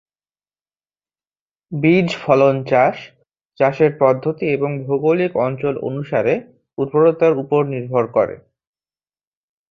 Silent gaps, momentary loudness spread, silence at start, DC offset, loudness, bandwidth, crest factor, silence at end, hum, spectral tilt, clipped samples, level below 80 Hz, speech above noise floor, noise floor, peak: 3.45-3.50 s; 9 LU; 1.7 s; under 0.1%; -17 LUFS; 7.6 kHz; 18 dB; 1.35 s; 50 Hz at -45 dBFS; -8 dB/octave; under 0.1%; -60 dBFS; over 73 dB; under -90 dBFS; -2 dBFS